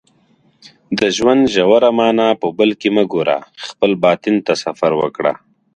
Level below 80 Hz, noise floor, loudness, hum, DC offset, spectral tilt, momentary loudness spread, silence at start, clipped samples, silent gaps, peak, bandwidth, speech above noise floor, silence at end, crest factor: -54 dBFS; -55 dBFS; -15 LUFS; none; under 0.1%; -5 dB/octave; 8 LU; 0.9 s; under 0.1%; none; 0 dBFS; 10 kHz; 41 dB; 0.4 s; 16 dB